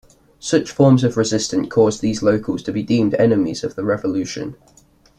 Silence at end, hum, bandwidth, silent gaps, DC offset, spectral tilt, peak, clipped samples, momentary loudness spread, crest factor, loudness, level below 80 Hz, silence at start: 0.65 s; none; 11 kHz; none; under 0.1%; -6 dB/octave; -2 dBFS; under 0.1%; 9 LU; 16 dB; -18 LUFS; -50 dBFS; 0.45 s